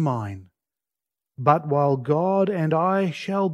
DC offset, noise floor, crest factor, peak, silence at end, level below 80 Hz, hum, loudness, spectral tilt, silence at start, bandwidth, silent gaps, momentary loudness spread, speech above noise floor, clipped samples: under 0.1%; -89 dBFS; 20 dB; -4 dBFS; 0 s; -66 dBFS; none; -22 LUFS; -8.5 dB/octave; 0 s; 11 kHz; none; 8 LU; 68 dB; under 0.1%